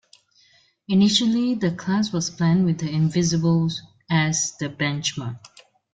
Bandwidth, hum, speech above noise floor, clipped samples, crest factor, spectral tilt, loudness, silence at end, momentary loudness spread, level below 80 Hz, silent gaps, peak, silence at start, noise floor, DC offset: 9.4 kHz; none; 38 dB; under 0.1%; 18 dB; -4.5 dB/octave; -22 LUFS; 0.5 s; 9 LU; -58 dBFS; none; -4 dBFS; 0.9 s; -59 dBFS; under 0.1%